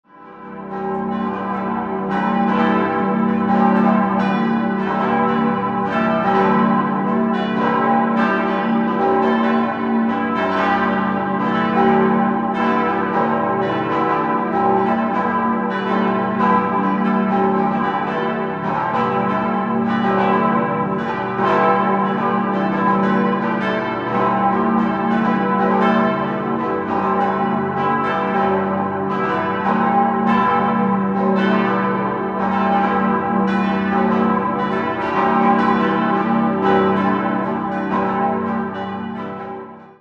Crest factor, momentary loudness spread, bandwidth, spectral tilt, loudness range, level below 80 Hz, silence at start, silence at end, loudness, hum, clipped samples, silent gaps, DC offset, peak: 14 dB; 5 LU; 6.4 kHz; -8.5 dB/octave; 2 LU; -52 dBFS; 0.2 s; 0.1 s; -18 LUFS; none; under 0.1%; none; under 0.1%; -2 dBFS